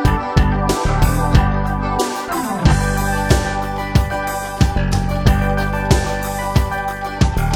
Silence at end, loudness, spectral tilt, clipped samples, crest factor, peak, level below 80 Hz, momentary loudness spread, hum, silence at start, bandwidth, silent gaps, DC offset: 0 s; -18 LUFS; -5.5 dB/octave; under 0.1%; 16 dB; 0 dBFS; -20 dBFS; 6 LU; none; 0 s; 18 kHz; none; under 0.1%